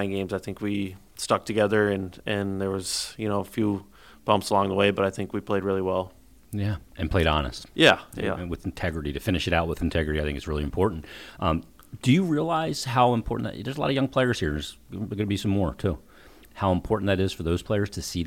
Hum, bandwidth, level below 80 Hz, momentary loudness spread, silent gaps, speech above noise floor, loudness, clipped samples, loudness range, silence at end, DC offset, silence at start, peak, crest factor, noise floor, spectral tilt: none; 17 kHz; -42 dBFS; 10 LU; none; 26 dB; -26 LUFS; under 0.1%; 3 LU; 0 s; 0.1%; 0 s; -4 dBFS; 22 dB; -51 dBFS; -5.5 dB/octave